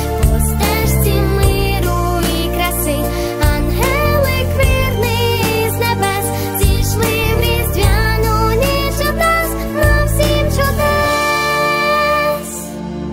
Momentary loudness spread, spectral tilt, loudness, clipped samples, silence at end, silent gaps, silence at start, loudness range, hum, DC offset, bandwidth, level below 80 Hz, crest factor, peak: 3 LU; -5 dB/octave; -15 LUFS; under 0.1%; 0 s; none; 0 s; 1 LU; none; 0.2%; 16.5 kHz; -20 dBFS; 14 dB; 0 dBFS